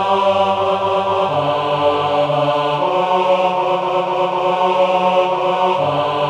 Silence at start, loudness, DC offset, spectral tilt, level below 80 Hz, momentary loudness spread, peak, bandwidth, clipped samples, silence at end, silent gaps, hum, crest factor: 0 s; -16 LUFS; under 0.1%; -6 dB/octave; -56 dBFS; 3 LU; -2 dBFS; 10 kHz; under 0.1%; 0 s; none; none; 14 dB